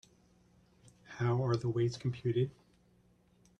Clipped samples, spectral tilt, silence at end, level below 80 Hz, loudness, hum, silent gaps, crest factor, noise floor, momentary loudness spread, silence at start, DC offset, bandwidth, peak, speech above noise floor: under 0.1%; -7.5 dB/octave; 1.1 s; -66 dBFS; -34 LUFS; none; none; 16 dB; -68 dBFS; 5 LU; 1.1 s; under 0.1%; 9 kHz; -20 dBFS; 35 dB